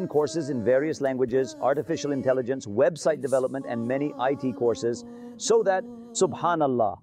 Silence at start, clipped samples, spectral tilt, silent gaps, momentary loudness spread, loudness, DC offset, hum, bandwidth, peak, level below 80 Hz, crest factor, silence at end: 0 s; under 0.1%; -5 dB/octave; none; 6 LU; -26 LUFS; under 0.1%; none; 12.5 kHz; -12 dBFS; -66 dBFS; 14 dB; 0.05 s